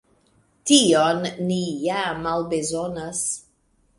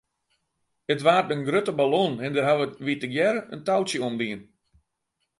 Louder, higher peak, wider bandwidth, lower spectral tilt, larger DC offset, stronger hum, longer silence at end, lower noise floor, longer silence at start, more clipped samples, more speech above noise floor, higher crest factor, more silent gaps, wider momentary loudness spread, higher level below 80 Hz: about the same, -22 LUFS vs -24 LUFS; about the same, -4 dBFS vs -6 dBFS; about the same, 11.5 kHz vs 11.5 kHz; second, -3.5 dB/octave vs -5 dB/octave; neither; neither; second, 0.6 s vs 0.95 s; second, -64 dBFS vs -79 dBFS; second, 0.65 s vs 0.9 s; neither; second, 42 dB vs 54 dB; about the same, 20 dB vs 20 dB; neither; first, 12 LU vs 9 LU; first, -56 dBFS vs -70 dBFS